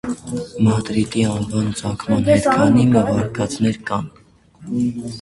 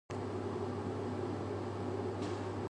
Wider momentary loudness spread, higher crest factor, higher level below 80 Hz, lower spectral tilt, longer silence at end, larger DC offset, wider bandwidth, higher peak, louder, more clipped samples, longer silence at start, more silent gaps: first, 12 LU vs 1 LU; first, 18 dB vs 12 dB; first, -44 dBFS vs -58 dBFS; about the same, -6.5 dB/octave vs -7.5 dB/octave; about the same, 0 s vs 0 s; neither; about the same, 11.5 kHz vs 10.5 kHz; first, 0 dBFS vs -26 dBFS; first, -18 LUFS vs -39 LUFS; neither; about the same, 0.05 s vs 0.1 s; neither